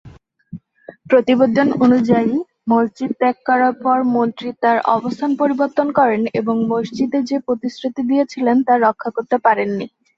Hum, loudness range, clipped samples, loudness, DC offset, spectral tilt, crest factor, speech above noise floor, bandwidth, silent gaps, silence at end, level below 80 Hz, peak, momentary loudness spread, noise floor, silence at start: none; 2 LU; under 0.1%; -17 LUFS; under 0.1%; -7 dB/octave; 14 dB; 26 dB; 7.2 kHz; none; 0.3 s; -60 dBFS; -2 dBFS; 8 LU; -42 dBFS; 0.05 s